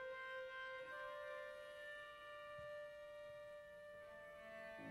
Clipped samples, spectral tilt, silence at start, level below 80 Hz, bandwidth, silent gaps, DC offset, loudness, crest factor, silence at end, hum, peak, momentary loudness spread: under 0.1%; -3.5 dB/octave; 0 s; -80 dBFS; 16 kHz; none; under 0.1%; -53 LUFS; 12 dB; 0 s; none; -40 dBFS; 7 LU